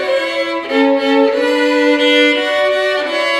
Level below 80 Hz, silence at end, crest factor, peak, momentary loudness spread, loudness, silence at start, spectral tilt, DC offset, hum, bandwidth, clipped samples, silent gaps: -62 dBFS; 0 s; 12 dB; 0 dBFS; 6 LU; -13 LUFS; 0 s; -2.5 dB/octave; under 0.1%; none; 12.5 kHz; under 0.1%; none